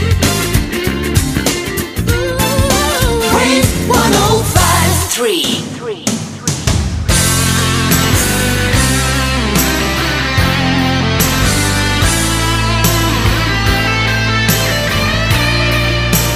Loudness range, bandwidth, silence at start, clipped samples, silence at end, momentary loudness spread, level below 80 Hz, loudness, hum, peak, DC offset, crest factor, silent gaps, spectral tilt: 2 LU; 15.5 kHz; 0 s; under 0.1%; 0 s; 5 LU; -22 dBFS; -12 LUFS; none; 0 dBFS; under 0.1%; 12 dB; none; -4 dB/octave